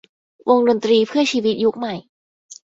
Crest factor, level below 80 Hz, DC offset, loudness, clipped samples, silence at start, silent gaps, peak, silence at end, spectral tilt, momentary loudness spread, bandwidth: 18 dB; -64 dBFS; under 0.1%; -18 LUFS; under 0.1%; 0.45 s; 2.09-2.49 s; -2 dBFS; 0.15 s; -4.5 dB/octave; 12 LU; 7.8 kHz